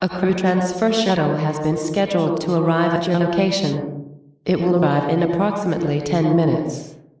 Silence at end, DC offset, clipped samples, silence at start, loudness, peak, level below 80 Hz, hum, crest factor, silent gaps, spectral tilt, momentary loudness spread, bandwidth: 0.2 s; under 0.1%; under 0.1%; 0 s; -19 LUFS; -6 dBFS; -52 dBFS; none; 14 dB; none; -6.5 dB/octave; 7 LU; 8 kHz